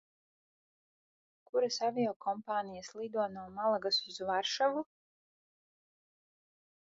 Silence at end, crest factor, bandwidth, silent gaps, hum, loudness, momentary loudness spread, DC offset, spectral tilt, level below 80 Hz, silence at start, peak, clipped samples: 2.1 s; 18 dB; 7.4 kHz; 2.16-2.20 s; none; -35 LUFS; 8 LU; under 0.1%; -1.5 dB/octave; -78 dBFS; 1.55 s; -20 dBFS; under 0.1%